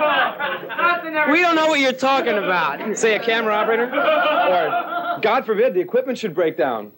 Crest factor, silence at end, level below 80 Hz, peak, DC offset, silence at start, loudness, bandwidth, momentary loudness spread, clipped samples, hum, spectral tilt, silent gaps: 14 dB; 0.05 s; -78 dBFS; -6 dBFS; under 0.1%; 0 s; -19 LUFS; 16.5 kHz; 6 LU; under 0.1%; none; -3.5 dB/octave; none